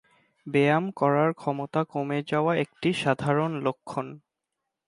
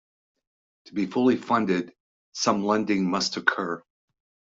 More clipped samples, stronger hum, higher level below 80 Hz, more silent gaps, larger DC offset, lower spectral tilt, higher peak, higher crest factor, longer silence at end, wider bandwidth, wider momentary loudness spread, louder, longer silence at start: neither; neither; about the same, -68 dBFS vs -68 dBFS; second, none vs 2.00-2.32 s; neither; first, -7 dB/octave vs -4.5 dB/octave; second, -8 dBFS vs -4 dBFS; second, 18 dB vs 24 dB; about the same, 0.7 s vs 0.8 s; first, 11.5 kHz vs 7.8 kHz; about the same, 11 LU vs 12 LU; about the same, -26 LUFS vs -25 LUFS; second, 0.45 s vs 0.85 s